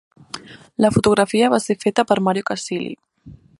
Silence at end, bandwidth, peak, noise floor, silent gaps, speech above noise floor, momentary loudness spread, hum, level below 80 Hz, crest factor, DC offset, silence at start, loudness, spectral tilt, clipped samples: 0.25 s; 11.5 kHz; 0 dBFS; -44 dBFS; none; 27 dB; 19 LU; none; -50 dBFS; 18 dB; under 0.1%; 0.35 s; -18 LUFS; -5 dB/octave; under 0.1%